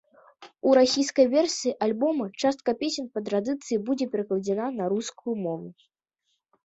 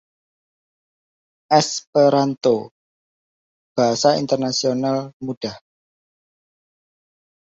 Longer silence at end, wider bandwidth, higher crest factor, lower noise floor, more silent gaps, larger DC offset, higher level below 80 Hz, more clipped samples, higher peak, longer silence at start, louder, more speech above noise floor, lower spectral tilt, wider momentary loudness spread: second, 0.9 s vs 2 s; about the same, 8.2 kHz vs 7.8 kHz; about the same, 18 dB vs 20 dB; second, -77 dBFS vs under -90 dBFS; second, none vs 1.87-1.93 s, 2.71-3.75 s, 5.13-5.20 s, 5.37-5.41 s; neither; about the same, -70 dBFS vs -66 dBFS; neither; second, -8 dBFS vs -2 dBFS; second, 0.4 s vs 1.5 s; second, -26 LUFS vs -19 LUFS; second, 52 dB vs over 72 dB; about the same, -4.5 dB/octave vs -4.5 dB/octave; about the same, 10 LU vs 12 LU